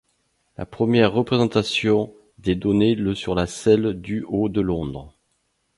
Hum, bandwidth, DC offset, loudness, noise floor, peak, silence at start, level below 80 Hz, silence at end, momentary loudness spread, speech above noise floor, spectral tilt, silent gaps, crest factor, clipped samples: none; 11.5 kHz; under 0.1%; -21 LUFS; -70 dBFS; -2 dBFS; 0.6 s; -46 dBFS; 0.7 s; 12 LU; 49 dB; -6.5 dB/octave; none; 18 dB; under 0.1%